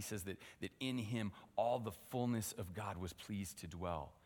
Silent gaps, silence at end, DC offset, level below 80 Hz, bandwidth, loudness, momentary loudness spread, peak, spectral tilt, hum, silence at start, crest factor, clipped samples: none; 0.15 s; under 0.1%; -66 dBFS; 19 kHz; -44 LUFS; 9 LU; -24 dBFS; -5 dB/octave; none; 0 s; 18 dB; under 0.1%